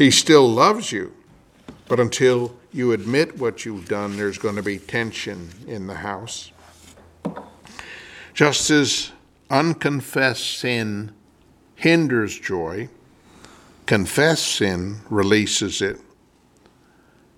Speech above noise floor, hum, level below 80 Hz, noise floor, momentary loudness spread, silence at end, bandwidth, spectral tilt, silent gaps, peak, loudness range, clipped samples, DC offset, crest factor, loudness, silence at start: 36 dB; none; -56 dBFS; -56 dBFS; 17 LU; 1.4 s; 17 kHz; -4 dB/octave; none; 0 dBFS; 7 LU; under 0.1%; under 0.1%; 22 dB; -20 LUFS; 0 s